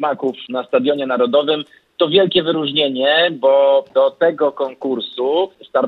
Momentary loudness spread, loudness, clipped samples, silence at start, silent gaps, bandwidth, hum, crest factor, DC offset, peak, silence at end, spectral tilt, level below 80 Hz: 9 LU; -16 LUFS; under 0.1%; 0 s; none; 4.6 kHz; none; 14 dB; under 0.1%; -2 dBFS; 0 s; -7 dB/octave; -66 dBFS